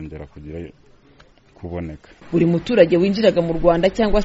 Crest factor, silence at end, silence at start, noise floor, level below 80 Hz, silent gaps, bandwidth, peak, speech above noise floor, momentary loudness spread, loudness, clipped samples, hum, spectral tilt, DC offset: 18 dB; 0 s; 0 s; -51 dBFS; -34 dBFS; none; 8 kHz; 0 dBFS; 33 dB; 20 LU; -17 LUFS; under 0.1%; none; -6 dB/octave; under 0.1%